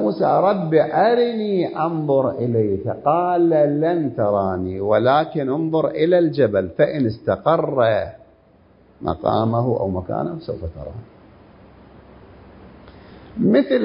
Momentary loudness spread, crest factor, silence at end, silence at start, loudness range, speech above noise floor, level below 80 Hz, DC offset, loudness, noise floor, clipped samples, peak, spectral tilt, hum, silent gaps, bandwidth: 11 LU; 18 dB; 0 s; 0 s; 8 LU; 34 dB; -46 dBFS; under 0.1%; -19 LUFS; -52 dBFS; under 0.1%; -2 dBFS; -12 dB/octave; none; none; 5.4 kHz